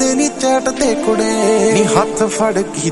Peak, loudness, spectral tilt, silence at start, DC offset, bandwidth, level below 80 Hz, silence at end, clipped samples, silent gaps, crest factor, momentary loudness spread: 0 dBFS; -14 LUFS; -4 dB/octave; 0 s; under 0.1%; 11.5 kHz; -42 dBFS; 0 s; under 0.1%; none; 14 dB; 4 LU